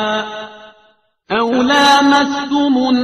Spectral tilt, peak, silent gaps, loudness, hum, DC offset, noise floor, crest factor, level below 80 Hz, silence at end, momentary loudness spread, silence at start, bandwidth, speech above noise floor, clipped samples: -3 dB/octave; 0 dBFS; none; -13 LUFS; none; under 0.1%; -54 dBFS; 14 dB; -52 dBFS; 0 s; 16 LU; 0 s; 14 kHz; 41 dB; under 0.1%